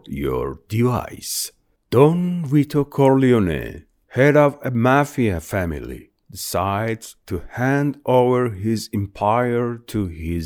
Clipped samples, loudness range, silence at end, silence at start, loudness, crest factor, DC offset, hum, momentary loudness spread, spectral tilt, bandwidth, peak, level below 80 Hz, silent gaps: under 0.1%; 4 LU; 0 s; 0.05 s; -20 LUFS; 18 dB; under 0.1%; none; 14 LU; -6.5 dB/octave; 19.5 kHz; 0 dBFS; -42 dBFS; none